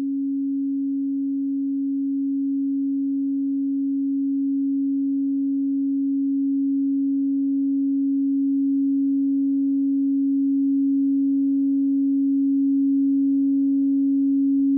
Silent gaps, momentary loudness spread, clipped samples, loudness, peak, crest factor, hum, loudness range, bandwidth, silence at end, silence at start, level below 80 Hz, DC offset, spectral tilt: none; 4 LU; under 0.1%; -22 LUFS; -16 dBFS; 6 dB; none; 4 LU; 0.6 kHz; 0 s; 0 s; -78 dBFS; under 0.1%; -14.5 dB/octave